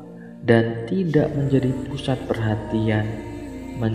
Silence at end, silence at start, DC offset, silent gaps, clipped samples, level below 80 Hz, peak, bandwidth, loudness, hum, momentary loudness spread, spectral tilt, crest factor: 0 s; 0 s; under 0.1%; none; under 0.1%; -44 dBFS; -2 dBFS; 10.5 kHz; -22 LUFS; none; 14 LU; -8 dB/octave; 20 dB